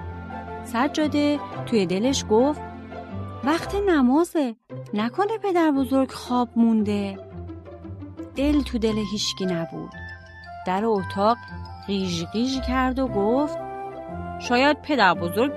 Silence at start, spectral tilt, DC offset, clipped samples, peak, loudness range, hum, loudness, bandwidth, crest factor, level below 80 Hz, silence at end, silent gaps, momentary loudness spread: 0 s; -5 dB/octave; under 0.1%; under 0.1%; -4 dBFS; 4 LU; none; -23 LUFS; 13 kHz; 20 dB; -44 dBFS; 0 s; none; 17 LU